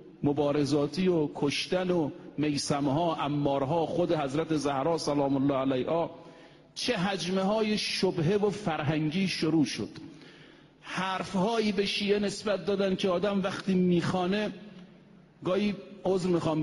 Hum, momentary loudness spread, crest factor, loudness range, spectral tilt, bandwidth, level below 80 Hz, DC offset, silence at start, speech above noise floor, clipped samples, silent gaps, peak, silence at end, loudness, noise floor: none; 7 LU; 16 dB; 2 LU; -5.5 dB/octave; 11.5 kHz; -60 dBFS; under 0.1%; 0 s; 27 dB; under 0.1%; none; -14 dBFS; 0 s; -29 LUFS; -55 dBFS